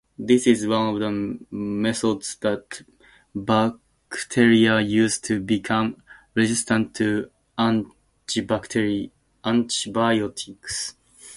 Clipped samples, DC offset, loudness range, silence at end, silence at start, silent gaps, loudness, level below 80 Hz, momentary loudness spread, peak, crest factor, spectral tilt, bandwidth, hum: under 0.1%; under 0.1%; 4 LU; 0 s; 0.2 s; none; -23 LUFS; -56 dBFS; 14 LU; -4 dBFS; 20 dB; -4.5 dB/octave; 11.5 kHz; none